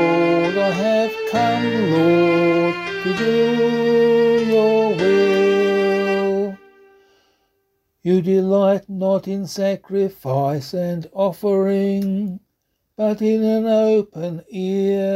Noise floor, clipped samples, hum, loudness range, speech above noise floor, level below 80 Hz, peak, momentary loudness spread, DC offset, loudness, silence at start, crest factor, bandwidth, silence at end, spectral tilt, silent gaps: -72 dBFS; under 0.1%; none; 5 LU; 53 dB; -60 dBFS; -4 dBFS; 8 LU; under 0.1%; -18 LUFS; 0 s; 14 dB; 15.5 kHz; 0 s; -7 dB/octave; none